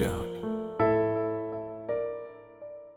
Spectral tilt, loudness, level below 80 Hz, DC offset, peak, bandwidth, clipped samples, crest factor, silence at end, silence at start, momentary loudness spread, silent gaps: -7 dB/octave; -30 LUFS; -52 dBFS; under 0.1%; -14 dBFS; 16 kHz; under 0.1%; 18 dB; 0 s; 0 s; 20 LU; none